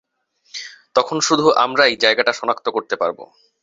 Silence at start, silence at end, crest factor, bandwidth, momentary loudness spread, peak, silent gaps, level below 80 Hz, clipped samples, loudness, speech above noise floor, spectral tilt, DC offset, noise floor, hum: 0.55 s; 0.35 s; 18 dB; 8 kHz; 18 LU; -2 dBFS; none; -66 dBFS; under 0.1%; -17 LUFS; 43 dB; -2.5 dB/octave; under 0.1%; -61 dBFS; none